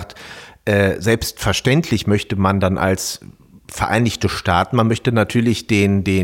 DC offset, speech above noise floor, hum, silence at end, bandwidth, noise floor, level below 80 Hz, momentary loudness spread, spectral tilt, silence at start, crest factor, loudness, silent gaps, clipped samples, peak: under 0.1%; 21 dB; none; 0 s; 17 kHz; -38 dBFS; -42 dBFS; 10 LU; -5.5 dB/octave; 0 s; 16 dB; -17 LUFS; none; under 0.1%; -2 dBFS